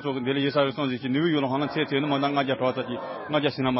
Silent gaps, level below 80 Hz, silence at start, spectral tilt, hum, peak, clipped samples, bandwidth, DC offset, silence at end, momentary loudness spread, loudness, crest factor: none; -64 dBFS; 0 s; -10.5 dB/octave; none; -10 dBFS; under 0.1%; 5.8 kHz; under 0.1%; 0 s; 5 LU; -26 LUFS; 14 dB